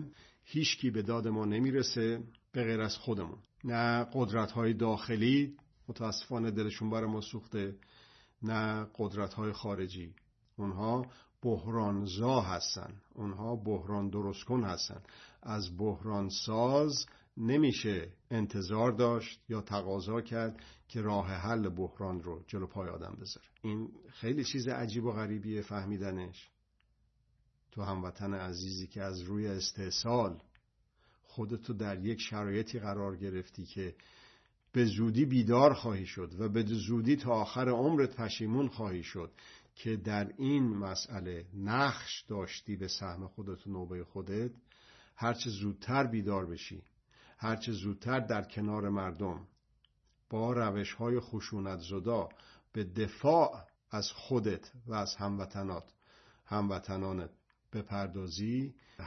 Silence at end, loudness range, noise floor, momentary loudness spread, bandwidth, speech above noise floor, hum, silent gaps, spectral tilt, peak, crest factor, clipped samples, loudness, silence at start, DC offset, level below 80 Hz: 0 s; 7 LU; -74 dBFS; 13 LU; 6.2 kHz; 40 dB; none; none; -5.5 dB/octave; -12 dBFS; 24 dB; under 0.1%; -35 LUFS; 0 s; under 0.1%; -66 dBFS